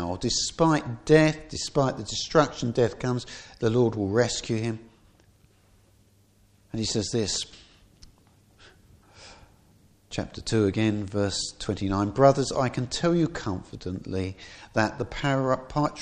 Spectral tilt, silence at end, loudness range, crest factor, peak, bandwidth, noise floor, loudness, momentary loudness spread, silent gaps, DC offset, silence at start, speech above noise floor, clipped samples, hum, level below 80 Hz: -5 dB/octave; 0 s; 8 LU; 22 dB; -4 dBFS; 10.5 kHz; -61 dBFS; -26 LUFS; 13 LU; none; under 0.1%; 0 s; 35 dB; under 0.1%; none; -50 dBFS